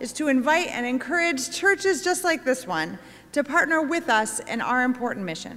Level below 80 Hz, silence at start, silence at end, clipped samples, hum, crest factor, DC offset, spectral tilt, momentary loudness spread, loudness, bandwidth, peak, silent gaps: -64 dBFS; 0 s; 0 s; under 0.1%; none; 16 dB; under 0.1%; -3 dB/octave; 8 LU; -23 LUFS; 16 kHz; -8 dBFS; none